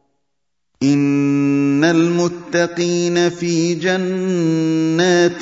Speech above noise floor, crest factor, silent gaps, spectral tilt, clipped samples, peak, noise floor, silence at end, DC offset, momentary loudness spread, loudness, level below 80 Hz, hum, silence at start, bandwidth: 61 dB; 14 dB; none; -5.5 dB/octave; under 0.1%; -2 dBFS; -78 dBFS; 0 s; under 0.1%; 5 LU; -16 LUFS; -60 dBFS; none; 0.8 s; 7.8 kHz